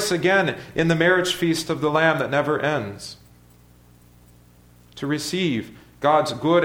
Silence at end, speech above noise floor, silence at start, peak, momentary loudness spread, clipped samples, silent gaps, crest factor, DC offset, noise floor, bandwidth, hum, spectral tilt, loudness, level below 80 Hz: 0 s; 31 dB; 0 s; -4 dBFS; 12 LU; under 0.1%; none; 18 dB; under 0.1%; -52 dBFS; 17 kHz; 60 Hz at -50 dBFS; -5 dB/octave; -21 LUFS; -54 dBFS